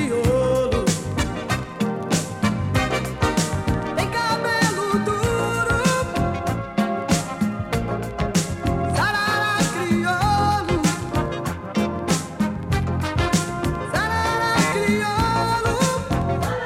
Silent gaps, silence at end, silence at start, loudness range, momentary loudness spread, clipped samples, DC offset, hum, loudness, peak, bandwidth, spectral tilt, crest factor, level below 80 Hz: none; 0 s; 0 s; 2 LU; 6 LU; under 0.1%; under 0.1%; none; -22 LUFS; -6 dBFS; 16.5 kHz; -5 dB/octave; 16 dB; -36 dBFS